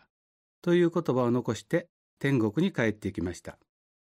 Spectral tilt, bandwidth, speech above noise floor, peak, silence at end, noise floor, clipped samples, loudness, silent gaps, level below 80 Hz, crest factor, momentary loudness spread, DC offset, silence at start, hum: -7 dB/octave; 13 kHz; over 63 dB; -12 dBFS; 0.5 s; under -90 dBFS; under 0.1%; -28 LUFS; 1.89-2.17 s; -62 dBFS; 18 dB; 11 LU; under 0.1%; 0.65 s; none